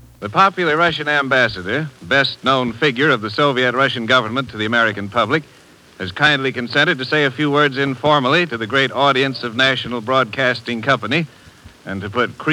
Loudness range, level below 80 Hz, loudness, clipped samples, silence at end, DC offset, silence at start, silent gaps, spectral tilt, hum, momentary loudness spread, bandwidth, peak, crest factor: 2 LU; -54 dBFS; -16 LUFS; under 0.1%; 0 s; under 0.1%; 0.2 s; none; -5 dB/octave; none; 7 LU; 14 kHz; 0 dBFS; 18 dB